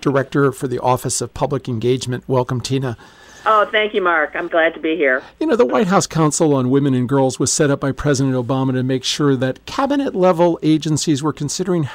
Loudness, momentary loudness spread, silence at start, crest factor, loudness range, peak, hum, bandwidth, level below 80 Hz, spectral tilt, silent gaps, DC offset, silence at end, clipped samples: -17 LUFS; 6 LU; 0 s; 16 dB; 3 LU; -2 dBFS; none; 16 kHz; -48 dBFS; -5 dB/octave; none; under 0.1%; 0 s; under 0.1%